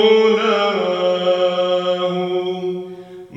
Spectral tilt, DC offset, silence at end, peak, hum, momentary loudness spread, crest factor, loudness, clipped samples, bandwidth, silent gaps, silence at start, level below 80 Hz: -5.5 dB/octave; under 0.1%; 0 s; -2 dBFS; none; 12 LU; 16 dB; -17 LUFS; under 0.1%; 7.8 kHz; none; 0 s; -70 dBFS